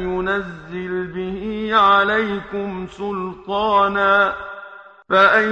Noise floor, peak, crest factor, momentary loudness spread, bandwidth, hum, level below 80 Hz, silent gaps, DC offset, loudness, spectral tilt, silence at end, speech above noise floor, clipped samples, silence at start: -39 dBFS; -2 dBFS; 18 dB; 16 LU; 8.8 kHz; none; -46 dBFS; none; under 0.1%; -18 LUFS; -6 dB/octave; 0 s; 21 dB; under 0.1%; 0 s